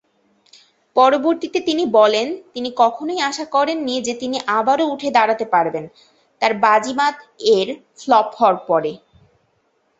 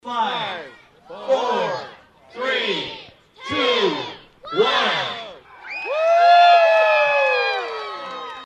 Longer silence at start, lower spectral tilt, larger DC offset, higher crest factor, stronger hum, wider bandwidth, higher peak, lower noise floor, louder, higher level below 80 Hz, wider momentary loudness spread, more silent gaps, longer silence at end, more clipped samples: first, 0.95 s vs 0.05 s; about the same, -3.5 dB/octave vs -3.5 dB/octave; neither; about the same, 18 dB vs 16 dB; neither; about the same, 8.2 kHz vs 8.4 kHz; about the same, -2 dBFS vs -4 dBFS; first, -64 dBFS vs -45 dBFS; about the same, -18 LUFS vs -18 LUFS; about the same, -64 dBFS vs -66 dBFS; second, 9 LU vs 20 LU; neither; first, 1.05 s vs 0 s; neither